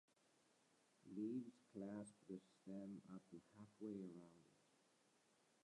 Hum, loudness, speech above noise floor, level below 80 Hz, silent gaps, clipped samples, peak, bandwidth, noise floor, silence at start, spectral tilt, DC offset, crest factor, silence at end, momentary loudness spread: none; -56 LUFS; 24 dB; under -90 dBFS; none; under 0.1%; -40 dBFS; 11 kHz; -80 dBFS; 1.05 s; -7.5 dB/octave; under 0.1%; 18 dB; 1.1 s; 14 LU